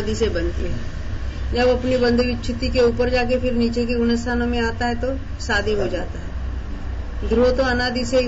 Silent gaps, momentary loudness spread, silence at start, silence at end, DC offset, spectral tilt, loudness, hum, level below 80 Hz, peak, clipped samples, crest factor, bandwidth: none; 12 LU; 0 s; 0 s; under 0.1%; -6 dB/octave; -21 LUFS; none; -28 dBFS; -8 dBFS; under 0.1%; 12 dB; 8 kHz